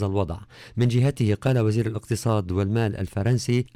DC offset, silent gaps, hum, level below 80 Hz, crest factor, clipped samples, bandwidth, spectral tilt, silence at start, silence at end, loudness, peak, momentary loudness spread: under 0.1%; none; none; -48 dBFS; 12 dB; under 0.1%; 13.5 kHz; -7 dB/octave; 0 s; 0.1 s; -24 LUFS; -12 dBFS; 6 LU